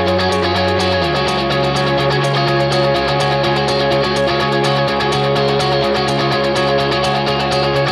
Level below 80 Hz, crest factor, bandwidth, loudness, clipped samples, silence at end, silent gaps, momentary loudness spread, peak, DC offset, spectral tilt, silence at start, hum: -38 dBFS; 12 dB; 13.5 kHz; -15 LUFS; under 0.1%; 0 s; none; 1 LU; -4 dBFS; under 0.1%; -5.5 dB/octave; 0 s; none